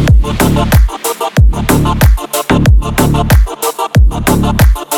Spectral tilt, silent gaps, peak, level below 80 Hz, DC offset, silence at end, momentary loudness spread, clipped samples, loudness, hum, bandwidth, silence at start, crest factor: -5.5 dB/octave; none; 0 dBFS; -12 dBFS; under 0.1%; 0 s; 5 LU; under 0.1%; -11 LUFS; none; 19 kHz; 0 s; 8 dB